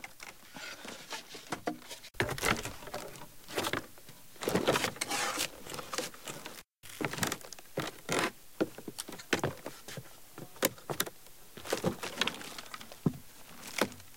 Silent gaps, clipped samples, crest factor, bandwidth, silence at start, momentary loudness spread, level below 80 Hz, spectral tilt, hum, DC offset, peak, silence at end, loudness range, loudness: none; under 0.1%; 30 dB; 17 kHz; 0 s; 16 LU; -60 dBFS; -3 dB/octave; none; 0.2%; -8 dBFS; 0 s; 3 LU; -36 LUFS